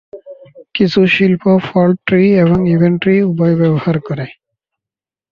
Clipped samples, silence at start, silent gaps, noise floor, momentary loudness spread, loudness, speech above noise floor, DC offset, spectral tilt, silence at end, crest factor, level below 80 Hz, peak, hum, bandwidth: under 0.1%; 0.15 s; none; -88 dBFS; 9 LU; -12 LUFS; 77 dB; under 0.1%; -9 dB/octave; 1 s; 12 dB; -46 dBFS; -2 dBFS; none; 6.6 kHz